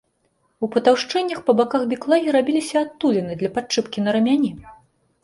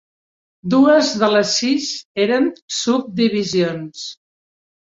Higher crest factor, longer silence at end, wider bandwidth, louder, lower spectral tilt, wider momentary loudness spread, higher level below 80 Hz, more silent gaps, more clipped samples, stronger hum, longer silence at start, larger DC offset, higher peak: about the same, 16 dB vs 16 dB; second, 0.5 s vs 0.75 s; first, 11.5 kHz vs 7.8 kHz; second, -20 LUFS vs -17 LUFS; about the same, -5 dB/octave vs -4 dB/octave; second, 7 LU vs 15 LU; about the same, -60 dBFS vs -62 dBFS; second, none vs 2.05-2.15 s, 2.62-2.68 s; neither; neither; about the same, 0.6 s vs 0.65 s; neither; about the same, -4 dBFS vs -2 dBFS